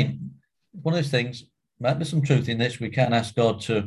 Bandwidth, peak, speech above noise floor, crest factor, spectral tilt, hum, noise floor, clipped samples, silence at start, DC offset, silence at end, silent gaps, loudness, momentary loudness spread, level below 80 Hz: 12 kHz; -6 dBFS; 24 dB; 18 dB; -6.5 dB/octave; none; -48 dBFS; under 0.1%; 0 s; under 0.1%; 0 s; none; -24 LUFS; 10 LU; -56 dBFS